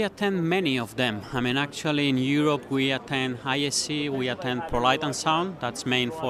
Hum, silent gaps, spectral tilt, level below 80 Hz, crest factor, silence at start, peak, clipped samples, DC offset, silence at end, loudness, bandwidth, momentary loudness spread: none; none; -4 dB/octave; -52 dBFS; 20 dB; 0 s; -6 dBFS; under 0.1%; under 0.1%; 0 s; -25 LUFS; 14 kHz; 5 LU